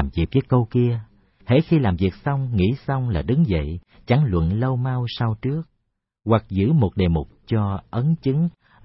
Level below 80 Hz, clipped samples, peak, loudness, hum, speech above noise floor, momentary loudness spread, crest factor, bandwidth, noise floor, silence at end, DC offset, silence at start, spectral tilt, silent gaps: -38 dBFS; under 0.1%; -4 dBFS; -22 LUFS; none; 54 dB; 7 LU; 16 dB; 5.8 kHz; -74 dBFS; 0.35 s; under 0.1%; 0 s; -12.5 dB/octave; none